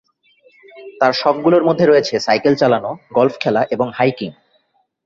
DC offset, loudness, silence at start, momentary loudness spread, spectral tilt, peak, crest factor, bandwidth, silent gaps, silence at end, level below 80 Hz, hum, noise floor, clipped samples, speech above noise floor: under 0.1%; -15 LUFS; 0.75 s; 7 LU; -6 dB/octave; 0 dBFS; 16 dB; 7.6 kHz; none; 0.75 s; -58 dBFS; none; -62 dBFS; under 0.1%; 47 dB